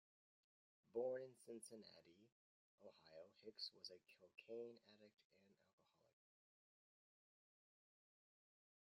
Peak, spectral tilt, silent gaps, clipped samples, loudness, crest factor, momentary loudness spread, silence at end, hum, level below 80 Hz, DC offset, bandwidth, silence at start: -36 dBFS; -3.5 dB/octave; 2.32-2.78 s, 5.24-5.30 s; under 0.1%; -55 LUFS; 22 dB; 19 LU; 3.4 s; none; under -90 dBFS; under 0.1%; 11.5 kHz; 0.95 s